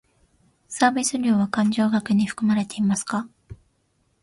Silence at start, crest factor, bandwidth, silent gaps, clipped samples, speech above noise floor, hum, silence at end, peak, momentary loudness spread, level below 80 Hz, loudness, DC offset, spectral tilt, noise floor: 0.7 s; 20 dB; 11.5 kHz; none; under 0.1%; 46 dB; none; 0.65 s; -4 dBFS; 9 LU; -58 dBFS; -22 LUFS; under 0.1%; -4.5 dB/octave; -67 dBFS